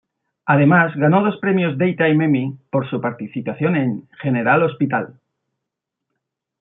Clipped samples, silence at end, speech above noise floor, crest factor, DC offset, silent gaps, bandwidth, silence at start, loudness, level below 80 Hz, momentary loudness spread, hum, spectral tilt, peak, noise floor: under 0.1%; 1.5 s; 64 dB; 16 dB; under 0.1%; none; 3.9 kHz; 0.45 s; -18 LUFS; -64 dBFS; 11 LU; none; -12 dB/octave; -2 dBFS; -81 dBFS